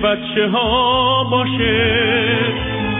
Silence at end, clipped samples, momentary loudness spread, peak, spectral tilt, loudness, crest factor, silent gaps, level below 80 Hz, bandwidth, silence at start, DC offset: 0 s; under 0.1%; 4 LU; -4 dBFS; -8.5 dB/octave; -15 LUFS; 12 dB; none; -36 dBFS; 3.9 kHz; 0 s; under 0.1%